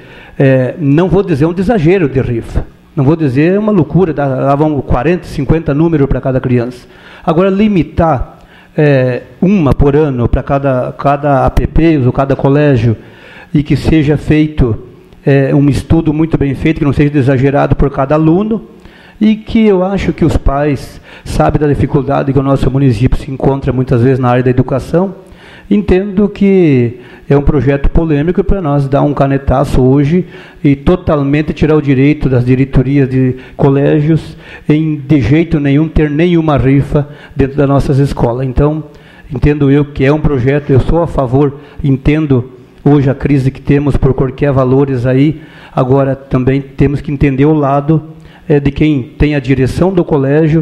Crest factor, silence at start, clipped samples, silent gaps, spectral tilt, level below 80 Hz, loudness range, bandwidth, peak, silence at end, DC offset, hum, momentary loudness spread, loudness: 10 dB; 0.1 s; under 0.1%; none; -9 dB/octave; -22 dBFS; 2 LU; 10.5 kHz; 0 dBFS; 0 s; under 0.1%; none; 6 LU; -11 LUFS